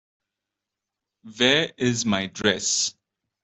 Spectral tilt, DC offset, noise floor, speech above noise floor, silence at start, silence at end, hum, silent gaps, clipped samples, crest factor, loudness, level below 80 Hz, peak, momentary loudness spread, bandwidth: -2.5 dB/octave; under 0.1%; -86 dBFS; 63 dB; 1.25 s; 0.5 s; none; none; under 0.1%; 22 dB; -22 LUFS; -62 dBFS; -4 dBFS; 5 LU; 8.4 kHz